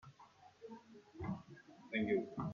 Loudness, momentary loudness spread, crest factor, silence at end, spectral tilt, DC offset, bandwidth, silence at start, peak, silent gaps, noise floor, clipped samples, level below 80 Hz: -41 LUFS; 24 LU; 18 dB; 0 s; -8 dB/octave; under 0.1%; 7.2 kHz; 0.05 s; -26 dBFS; none; -64 dBFS; under 0.1%; -70 dBFS